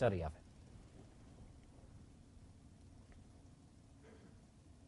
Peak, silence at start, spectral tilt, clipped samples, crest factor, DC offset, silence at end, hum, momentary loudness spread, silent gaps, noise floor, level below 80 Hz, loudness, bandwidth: -22 dBFS; 0 s; -7.5 dB/octave; under 0.1%; 26 dB; under 0.1%; 0.5 s; none; 13 LU; none; -63 dBFS; -60 dBFS; -52 LUFS; 11 kHz